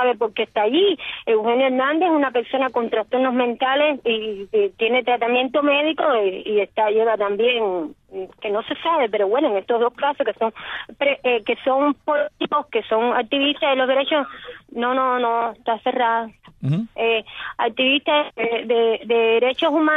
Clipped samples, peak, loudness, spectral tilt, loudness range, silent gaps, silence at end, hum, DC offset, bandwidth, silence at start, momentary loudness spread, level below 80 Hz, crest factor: under 0.1%; -6 dBFS; -20 LUFS; -7.5 dB/octave; 2 LU; none; 0 s; none; under 0.1%; 4 kHz; 0 s; 7 LU; -62 dBFS; 14 dB